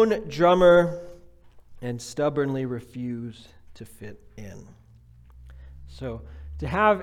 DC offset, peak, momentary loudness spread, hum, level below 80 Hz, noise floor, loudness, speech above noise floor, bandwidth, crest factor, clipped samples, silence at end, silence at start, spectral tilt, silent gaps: under 0.1%; -6 dBFS; 26 LU; none; -48 dBFS; -52 dBFS; -23 LUFS; 28 dB; 13 kHz; 20 dB; under 0.1%; 0 s; 0 s; -6.5 dB/octave; none